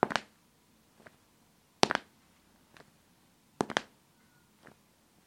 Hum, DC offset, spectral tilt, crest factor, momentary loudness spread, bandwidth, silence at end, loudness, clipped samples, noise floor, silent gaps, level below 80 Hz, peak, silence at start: none; under 0.1%; -3 dB/octave; 38 dB; 21 LU; 16.5 kHz; 1.45 s; -33 LUFS; under 0.1%; -66 dBFS; none; -72 dBFS; -2 dBFS; 0.05 s